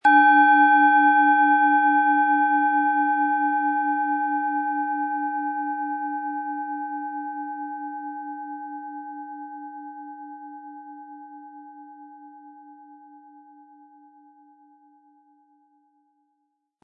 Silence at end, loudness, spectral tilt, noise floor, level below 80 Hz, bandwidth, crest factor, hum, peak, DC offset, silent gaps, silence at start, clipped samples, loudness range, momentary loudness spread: 3.9 s; -21 LUFS; -4 dB/octave; -75 dBFS; -86 dBFS; 4.7 kHz; 18 dB; none; -6 dBFS; under 0.1%; none; 0.05 s; under 0.1%; 24 LU; 24 LU